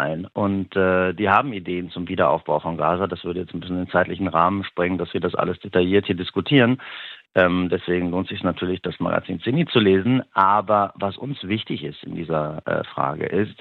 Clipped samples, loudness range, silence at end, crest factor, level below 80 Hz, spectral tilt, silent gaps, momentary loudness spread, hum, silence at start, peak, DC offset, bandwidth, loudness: under 0.1%; 2 LU; 0.1 s; 20 dB; -54 dBFS; -9 dB/octave; none; 10 LU; none; 0 s; -2 dBFS; under 0.1%; 4.5 kHz; -22 LUFS